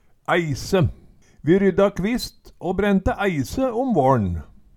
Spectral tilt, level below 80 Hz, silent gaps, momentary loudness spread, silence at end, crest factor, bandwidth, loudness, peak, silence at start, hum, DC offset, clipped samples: -6.5 dB/octave; -38 dBFS; none; 9 LU; 0.3 s; 18 dB; 16.5 kHz; -21 LUFS; -4 dBFS; 0.3 s; none; under 0.1%; under 0.1%